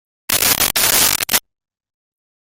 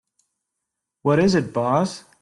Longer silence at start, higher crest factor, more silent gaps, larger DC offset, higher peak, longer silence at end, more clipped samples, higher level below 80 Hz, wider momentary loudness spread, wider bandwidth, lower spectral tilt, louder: second, 0.3 s vs 1.05 s; about the same, 20 dB vs 16 dB; neither; neither; first, 0 dBFS vs -6 dBFS; first, 1.2 s vs 0.2 s; neither; first, -44 dBFS vs -54 dBFS; second, 6 LU vs 9 LU; first, over 20 kHz vs 11.5 kHz; second, 0 dB/octave vs -6.5 dB/octave; first, -13 LUFS vs -21 LUFS